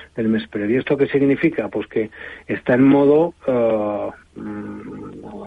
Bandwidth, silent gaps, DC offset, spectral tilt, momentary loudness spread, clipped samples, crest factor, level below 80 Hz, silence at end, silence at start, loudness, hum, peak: 4.7 kHz; none; under 0.1%; -9 dB/octave; 19 LU; under 0.1%; 16 dB; -54 dBFS; 0 s; 0 s; -18 LUFS; none; -4 dBFS